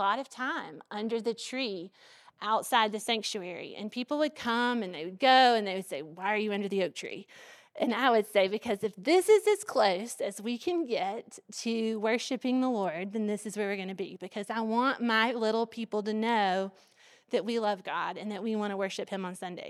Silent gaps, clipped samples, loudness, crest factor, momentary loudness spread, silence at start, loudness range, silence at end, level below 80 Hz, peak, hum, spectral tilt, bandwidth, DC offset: none; under 0.1%; -30 LUFS; 20 dB; 13 LU; 0 s; 4 LU; 0 s; -82 dBFS; -10 dBFS; none; -4 dB/octave; 14.5 kHz; under 0.1%